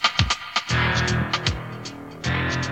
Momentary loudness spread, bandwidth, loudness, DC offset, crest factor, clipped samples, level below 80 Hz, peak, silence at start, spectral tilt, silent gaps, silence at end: 13 LU; 10.5 kHz; -23 LUFS; 0.1%; 22 dB; under 0.1%; -38 dBFS; -2 dBFS; 0 s; -4 dB/octave; none; 0 s